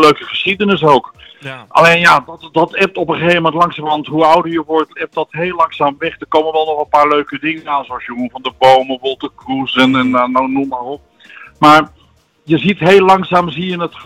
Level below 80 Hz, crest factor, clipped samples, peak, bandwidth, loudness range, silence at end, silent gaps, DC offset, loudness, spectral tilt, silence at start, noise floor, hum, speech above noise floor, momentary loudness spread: -50 dBFS; 12 dB; under 0.1%; 0 dBFS; 16.5 kHz; 3 LU; 0 s; none; under 0.1%; -12 LUFS; -5.5 dB/octave; 0 s; -51 dBFS; none; 39 dB; 13 LU